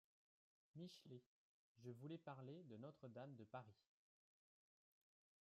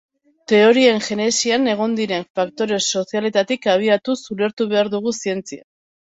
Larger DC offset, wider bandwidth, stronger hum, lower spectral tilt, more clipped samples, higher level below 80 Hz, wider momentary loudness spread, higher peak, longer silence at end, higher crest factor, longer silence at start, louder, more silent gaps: neither; second, 7 kHz vs 8 kHz; neither; first, -6.5 dB/octave vs -3.5 dB/octave; neither; second, under -90 dBFS vs -64 dBFS; second, 7 LU vs 10 LU; second, -42 dBFS vs -2 dBFS; first, 1.75 s vs 0.5 s; about the same, 20 dB vs 16 dB; first, 0.75 s vs 0.5 s; second, -60 LUFS vs -18 LUFS; first, 1.26-1.75 s vs 2.30-2.34 s, 4.53-4.57 s